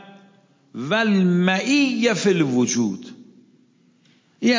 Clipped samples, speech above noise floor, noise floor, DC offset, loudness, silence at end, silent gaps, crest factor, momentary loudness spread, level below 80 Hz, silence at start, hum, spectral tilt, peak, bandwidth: under 0.1%; 39 dB; -58 dBFS; under 0.1%; -19 LUFS; 0 s; none; 18 dB; 11 LU; -70 dBFS; 0.75 s; none; -5 dB/octave; -4 dBFS; 7.6 kHz